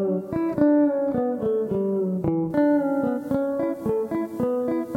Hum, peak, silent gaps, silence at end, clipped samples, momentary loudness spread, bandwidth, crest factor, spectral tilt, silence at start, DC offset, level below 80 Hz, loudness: none; -8 dBFS; none; 0 s; under 0.1%; 6 LU; 15.5 kHz; 16 dB; -9.5 dB/octave; 0 s; under 0.1%; -56 dBFS; -24 LUFS